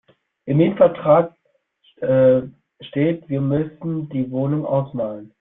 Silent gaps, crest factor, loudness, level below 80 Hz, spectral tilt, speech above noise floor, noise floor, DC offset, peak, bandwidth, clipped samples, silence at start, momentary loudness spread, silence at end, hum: none; 18 dB; -20 LUFS; -56 dBFS; -12.5 dB/octave; 44 dB; -63 dBFS; under 0.1%; -2 dBFS; 3.9 kHz; under 0.1%; 0.45 s; 13 LU; 0.15 s; none